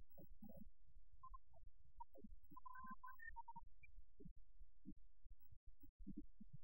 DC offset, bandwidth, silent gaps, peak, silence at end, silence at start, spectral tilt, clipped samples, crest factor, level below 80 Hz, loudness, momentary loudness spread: 0.2%; 16 kHz; 4.31-4.36 s, 5.26-5.30 s, 5.56-5.67 s, 5.89-6.00 s; -42 dBFS; 0 s; 0 s; -7.5 dB/octave; under 0.1%; 18 dB; -66 dBFS; -63 LUFS; 10 LU